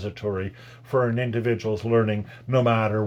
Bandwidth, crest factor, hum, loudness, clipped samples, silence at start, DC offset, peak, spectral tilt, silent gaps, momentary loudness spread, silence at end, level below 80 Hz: 7.6 kHz; 16 dB; none; -24 LUFS; under 0.1%; 0 s; under 0.1%; -8 dBFS; -8 dB/octave; none; 9 LU; 0 s; -62 dBFS